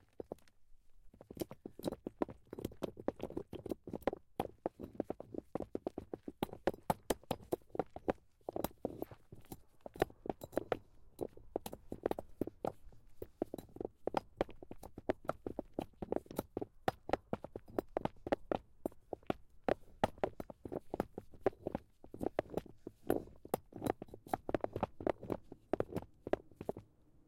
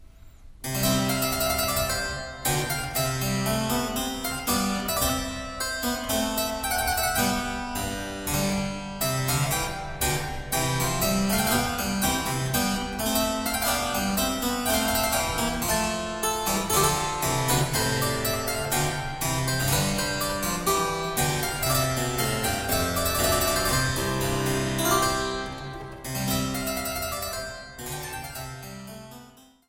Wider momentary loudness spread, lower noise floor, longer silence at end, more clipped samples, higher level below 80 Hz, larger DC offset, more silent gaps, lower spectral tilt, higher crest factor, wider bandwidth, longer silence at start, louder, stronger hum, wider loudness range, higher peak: about the same, 9 LU vs 8 LU; first, -60 dBFS vs -51 dBFS; second, 0.05 s vs 0.25 s; neither; second, -62 dBFS vs -40 dBFS; neither; neither; first, -6 dB/octave vs -3.5 dB/octave; first, 24 dB vs 18 dB; about the same, 16.5 kHz vs 17 kHz; first, 0.3 s vs 0 s; second, -43 LUFS vs -25 LUFS; neither; about the same, 3 LU vs 3 LU; second, -20 dBFS vs -8 dBFS